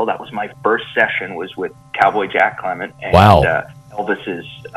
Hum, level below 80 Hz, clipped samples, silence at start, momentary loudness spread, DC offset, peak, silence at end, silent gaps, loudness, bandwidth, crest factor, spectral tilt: none; -38 dBFS; 0.2%; 0 s; 16 LU; under 0.1%; 0 dBFS; 0 s; none; -16 LUFS; 13 kHz; 16 dB; -6.5 dB/octave